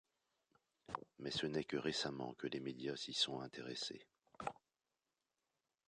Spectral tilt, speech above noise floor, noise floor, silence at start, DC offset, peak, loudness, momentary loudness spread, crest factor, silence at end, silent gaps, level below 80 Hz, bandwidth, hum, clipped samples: -3.5 dB/octave; over 46 dB; under -90 dBFS; 0.9 s; under 0.1%; -24 dBFS; -44 LUFS; 11 LU; 22 dB; 1.35 s; none; -76 dBFS; 10 kHz; none; under 0.1%